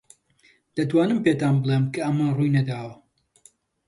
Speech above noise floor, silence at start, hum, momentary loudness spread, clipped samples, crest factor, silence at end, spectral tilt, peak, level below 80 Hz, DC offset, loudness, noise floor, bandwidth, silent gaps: 39 dB; 0.75 s; none; 11 LU; under 0.1%; 16 dB; 0.95 s; -8 dB/octave; -8 dBFS; -62 dBFS; under 0.1%; -23 LUFS; -61 dBFS; 11.5 kHz; none